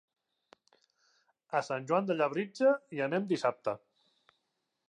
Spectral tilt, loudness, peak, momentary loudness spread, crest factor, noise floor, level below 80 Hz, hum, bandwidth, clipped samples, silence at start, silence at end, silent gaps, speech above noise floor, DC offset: -6 dB/octave; -32 LUFS; -16 dBFS; 8 LU; 18 dB; -83 dBFS; -86 dBFS; none; 10 kHz; under 0.1%; 1.5 s; 1.1 s; none; 52 dB; under 0.1%